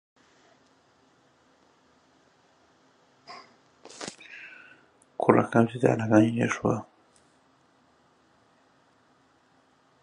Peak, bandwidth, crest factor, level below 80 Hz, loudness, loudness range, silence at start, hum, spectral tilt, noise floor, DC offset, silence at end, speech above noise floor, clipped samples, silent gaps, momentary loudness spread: -2 dBFS; 10.5 kHz; 28 dB; -66 dBFS; -25 LUFS; 21 LU; 3.3 s; none; -7 dB/octave; -64 dBFS; under 0.1%; 3.2 s; 41 dB; under 0.1%; none; 26 LU